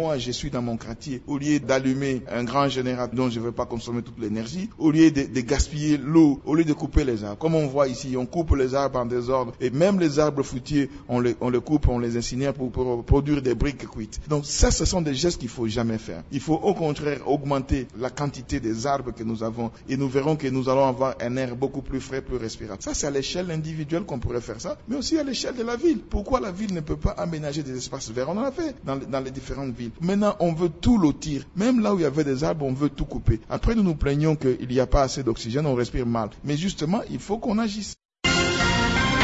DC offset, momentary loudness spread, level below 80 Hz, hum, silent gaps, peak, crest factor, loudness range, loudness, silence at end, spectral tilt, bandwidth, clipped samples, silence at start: under 0.1%; 10 LU; -36 dBFS; none; 38.05-38.09 s; -4 dBFS; 20 dB; 5 LU; -25 LUFS; 0 s; -5.5 dB/octave; 8 kHz; under 0.1%; 0 s